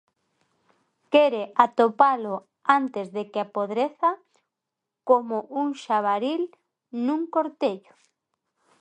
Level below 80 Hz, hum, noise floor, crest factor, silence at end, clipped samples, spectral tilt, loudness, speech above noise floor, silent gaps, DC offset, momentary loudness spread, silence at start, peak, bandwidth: -80 dBFS; none; -85 dBFS; 24 dB; 1 s; under 0.1%; -5.5 dB/octave; -24 LUFS; 62 dB; none; under 0.1%; 11 LU; 1.1 s; -2 dBFS; 9.2 kHz